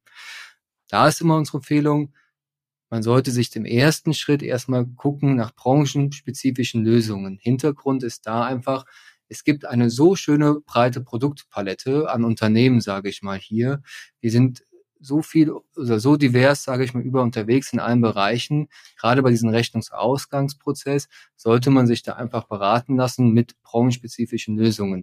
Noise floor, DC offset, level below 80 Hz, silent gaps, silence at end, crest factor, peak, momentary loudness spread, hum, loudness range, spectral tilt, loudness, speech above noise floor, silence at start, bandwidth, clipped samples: under -90 dBFS; under 0.1%; -62 dBFS; none; 0 s; 18 dB; -2 dBFS; 10 LU; none; 3 LU; -6.5 dB/octave; -21 LUFS; over 70 dB; 0.15 s; 15.5 kHz; under 0.1%